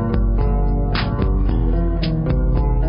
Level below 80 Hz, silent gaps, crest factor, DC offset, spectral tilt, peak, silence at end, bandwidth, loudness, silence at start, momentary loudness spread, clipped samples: -18 dBFS; none; 12 dB; under 0.1%; -12 dB/octave; -6 dBFS; 0 s; 5.4 kHz; -20 LUFS; 0 s; 1 LU; under 0.1%